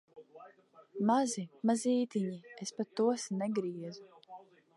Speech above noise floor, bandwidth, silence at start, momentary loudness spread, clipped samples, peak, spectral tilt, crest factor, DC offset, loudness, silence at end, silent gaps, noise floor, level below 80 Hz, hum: 27 dB; 11.5 kHz; 0.15 s; 23 LU; under 0.1%; -16 dBFS; -5.5 dB/octave; 18 dB; under 0.1%; -34 LUFS; 0.4 s; none; -60 dBFS; -88 dBFS; none